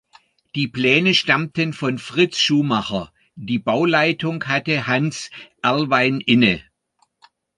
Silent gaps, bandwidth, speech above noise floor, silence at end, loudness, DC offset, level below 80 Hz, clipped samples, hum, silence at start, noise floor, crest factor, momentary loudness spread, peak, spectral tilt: none; 11 kHz; 46 dB; 0.95 s; -19 LUFS; under 0.1%; -56 dBFS; under 0.1%; none; 0.55 s; -65 dBFS; 18 dB; 12 LU; -2 dBFS; -5 dB/octave